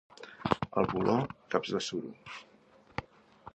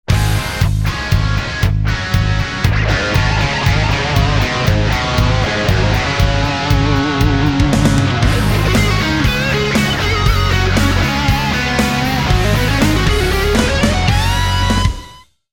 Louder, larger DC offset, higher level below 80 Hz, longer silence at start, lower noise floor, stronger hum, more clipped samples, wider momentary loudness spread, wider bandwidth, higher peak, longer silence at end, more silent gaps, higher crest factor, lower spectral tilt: second, -33 LUFS vs -14 LUFS; second, under 0.1% vs 0.5%; second, -60 dBFS vs -20 dBFS; about the same, 0.2 s vs 0.1 s; first, -55 dBFS vs -39 dBFS; neither; neither; first, 17 LU vs 3 LU; second, 8.8 kHz vs 19.5 kHz; second, -8 dBFS vs 0 dBFS; second, 0.05 s vs 0.35 s; neither; first, 26 dB vs 14 dB; about the same, -5.5 dB/octave vs -5 dB/octave